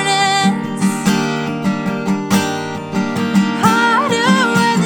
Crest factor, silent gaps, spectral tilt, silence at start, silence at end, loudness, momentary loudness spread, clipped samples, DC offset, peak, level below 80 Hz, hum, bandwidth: 14 dB; none; -4.5 dB/octave; 0 s; 0 s; -15 LUFS; 7 LU; under 0.1%; under 0.1%; 0 dBFS; -54 dBFS; none; 19.5 kHz